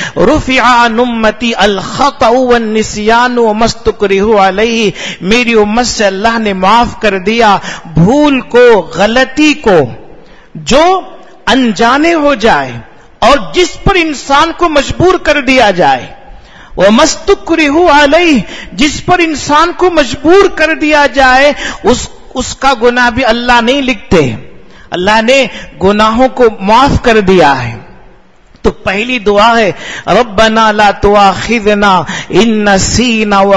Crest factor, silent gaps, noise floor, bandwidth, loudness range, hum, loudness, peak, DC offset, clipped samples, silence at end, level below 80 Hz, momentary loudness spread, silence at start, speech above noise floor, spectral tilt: 8 dB; none; -41 dBFS; 11 kHz; 2 LU; none; -8 LUFS; 0 dBFS; under 0.1%; 2%; 0 s; -28 dBFS; 7 LU; 0 s; 33 dB; -4.5 dB/octave